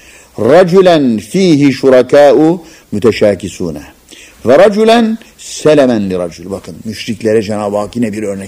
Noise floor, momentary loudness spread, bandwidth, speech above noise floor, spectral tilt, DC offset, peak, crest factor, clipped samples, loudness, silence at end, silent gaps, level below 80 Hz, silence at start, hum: -37 dBFS; 16 LU; 16 kHz; 28 dB; -6 dB/octave; under 0.1%; 0 dBFS; 10 dB; 1%; -9 LUFS; 0 s; none; -46 dBFS; 0.4 s; none